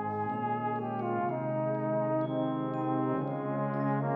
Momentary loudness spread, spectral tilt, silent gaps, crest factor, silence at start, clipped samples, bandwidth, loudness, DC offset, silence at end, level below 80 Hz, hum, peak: 3 LU; -11 dB/octave; none; 12 dB; 0 s; under 0.1%; 4 kHz; -32 LUFS; under 0.1%; 0 s; -78 dBFS; none; -20 dBFS